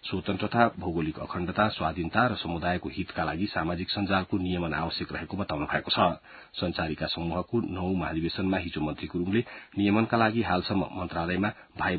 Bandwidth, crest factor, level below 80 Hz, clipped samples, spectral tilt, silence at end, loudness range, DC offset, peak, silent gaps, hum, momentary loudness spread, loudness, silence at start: 4.8 kHz; 22 dB; -48 dBFS; under 0.1%; -10.5 dB/octave; 0 s; 2 LU; under 0.1%; -6 dBFS; none; none; 8 LU; -29 LUFS; 0.05 s